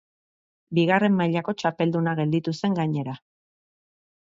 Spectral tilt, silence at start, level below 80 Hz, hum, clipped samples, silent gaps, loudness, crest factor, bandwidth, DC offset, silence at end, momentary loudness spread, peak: -7.5 dB/octave; 0.7 s; -68 dBFS; none; under 0.1%; none; -24 LUFS; 18 dB; 7.6 kHz; under 0.1%; 1.15 s; 8 LU; -6 dBFS